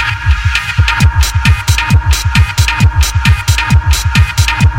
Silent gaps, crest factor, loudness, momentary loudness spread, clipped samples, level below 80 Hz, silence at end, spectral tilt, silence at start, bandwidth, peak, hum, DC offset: none; 10 dB; -11 LUFS; 2 LU; under 0.1%; -14 dBFS; 0 s; -4 dB/octave; 0 s; 17 kHz; 0 dBFS; none; under 0.1%